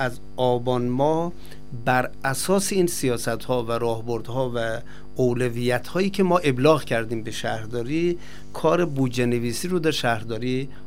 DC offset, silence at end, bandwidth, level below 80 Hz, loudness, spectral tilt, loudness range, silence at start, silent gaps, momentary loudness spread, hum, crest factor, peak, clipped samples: 3%; 0 s; 16 kHz; -48 dBFS; -24 LUFS; -5 dB/octave; 2 LU; 0 s; none; 8 LU; none; 20 dB; -4 dBFS; under 0.1%